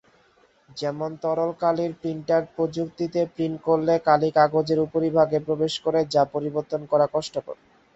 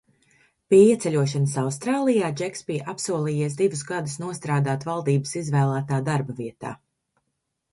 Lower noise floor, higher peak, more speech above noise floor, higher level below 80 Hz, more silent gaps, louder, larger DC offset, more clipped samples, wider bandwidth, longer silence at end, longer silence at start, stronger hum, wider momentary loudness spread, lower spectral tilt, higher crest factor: second, -60 dBFS vs -78 dBFS; about the same, -4 dBFS vs -4 dBFS; second, 37 dB vs 55 dB; about the same, -62 dBFS vs -64 dBFS; neither; about the same, -24 LUFS vs -23 LUFS; neither; neither; second, 8.2 kHz vs 11.5 kHz; second, 0.4 s vs 1 s; about the same, 0.75 s vs 0.7 s; neither; second, 10 LU vs 13 LU; about the same, -6.5 dB/octave vs -6.5 dB/octave; about the same, 20 dB vs 18 dB